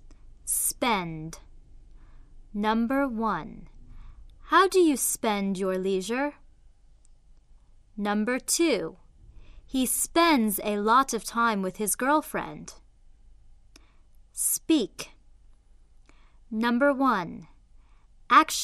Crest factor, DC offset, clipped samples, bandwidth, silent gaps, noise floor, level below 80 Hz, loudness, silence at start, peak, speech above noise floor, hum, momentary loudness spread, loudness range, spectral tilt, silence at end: 22 dB; under 0.1%; under 0.1%; 14 kHz; none; -55 dBFS; -52 dBFS; -25 LUFS; 0.05 s; -6 dBFS; 30 dB; none; 18 LU; 7 LU; -3 dB/octave; 0 s